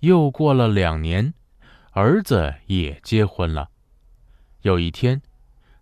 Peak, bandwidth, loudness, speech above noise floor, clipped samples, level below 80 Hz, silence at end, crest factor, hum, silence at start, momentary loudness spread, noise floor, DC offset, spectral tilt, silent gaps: -4 dBFS; 14.5 kHz; -21 LUFS; 35 dB; under 0.1%; -34 dBFS; 0.6 s; 18 dB; none; 0 s; 10 LU; -53 dBFS; under 0.1%; -7.5 dB/octave; none